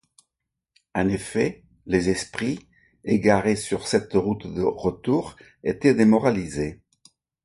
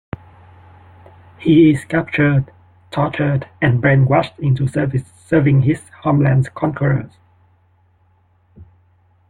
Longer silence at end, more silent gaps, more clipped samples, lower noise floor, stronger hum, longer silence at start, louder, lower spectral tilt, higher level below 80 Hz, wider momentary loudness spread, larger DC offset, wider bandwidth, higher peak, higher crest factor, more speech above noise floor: about the same, 0.7 s vs 0.65 s; neither; neither; first, -83 dBFS vs -56 dBFS; neither; second, 0.95 s vs 1.4 s; second, -23 LUFS vs -16 LUFS; second, -6 dB/octave vs -8.5 dB/octave; about the same, -50 dBFS vs -46 dBFS; first, 13 LU vs 10 LU; neither; about the same, 11.5 kHz vs 10.5 kHz; about the same, -4 dBFS vs -2 dBFS; about the same, 20 dB vs 16 dB; first, 61 dB vs 41 dB